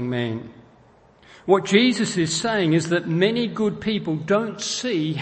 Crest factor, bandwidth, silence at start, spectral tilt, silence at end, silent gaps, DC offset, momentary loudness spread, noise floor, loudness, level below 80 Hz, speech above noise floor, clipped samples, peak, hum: 20 dB; 8.8 kHz; 0 s; -4.5 dB/octave; 0 s; none; under 0.1%; 8 LU; -53 dBFS; -21 LUFS; -58 dBFS; 32 dB; under 0.1%; -2 dBFS; none